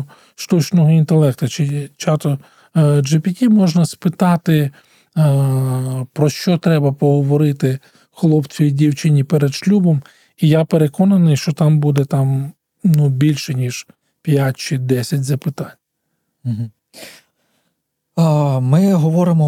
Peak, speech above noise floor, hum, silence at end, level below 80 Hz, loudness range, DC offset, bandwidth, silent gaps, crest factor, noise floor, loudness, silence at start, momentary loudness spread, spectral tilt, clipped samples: -2 dBFS; 57 dB; none; 0 s; -60 dBFS; 6 LU; under 0.1%; 15 kHz; none; 14 dB; -72 dBFS; -16 LUFS; 0 s; 11 LU; -7.5 dB/octave; under 0.1%